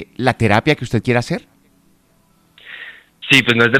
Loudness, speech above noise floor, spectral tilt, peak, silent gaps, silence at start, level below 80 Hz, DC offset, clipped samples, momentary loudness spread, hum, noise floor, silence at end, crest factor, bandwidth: -15 LUFS; 41 dB; -5 dB/octave; 0 dBFS; none; 0 s; -48 dBFS; under 0.1%; under 0.1%; 22 LU; none; -56 dBFS; 0 s; 18 dB; 16 kHz